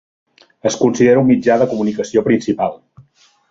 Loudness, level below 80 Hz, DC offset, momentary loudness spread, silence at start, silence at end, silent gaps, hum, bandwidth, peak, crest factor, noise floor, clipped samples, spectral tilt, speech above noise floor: -15 LUFS; -54 dBFS; under 0.1%; 9 LU; 0.65 s; 0.75 s; none; none; 7.8 kHz; -2 dBFS; 14 dB; -51 dBFS; under 0.1%; -6 dB/octave; 37 dB